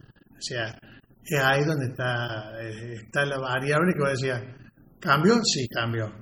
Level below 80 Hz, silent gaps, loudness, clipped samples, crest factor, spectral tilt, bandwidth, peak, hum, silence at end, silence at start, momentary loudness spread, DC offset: -58 dBFS; none; -25 LUFS; under 0.1%; 18 dB; -4.5 dB/octave; over 20 kHz; -8 dBFS; none; 0 s; 0.4 s; 15 LU; under 0.1%